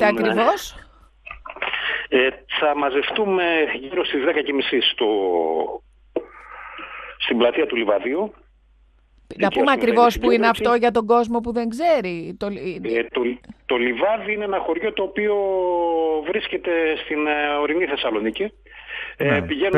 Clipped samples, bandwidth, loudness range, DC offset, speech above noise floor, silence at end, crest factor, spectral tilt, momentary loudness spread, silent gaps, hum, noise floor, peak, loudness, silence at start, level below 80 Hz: under 0.1%; 13 kHz; 4 LU; under 0.1%; 35 dB; 0 s; 18 dB; -5 dB/octave; 14 LU; none; none; -55 dBFS; -2 dBFS; -21 LUFS; 0 s; -50 dBFS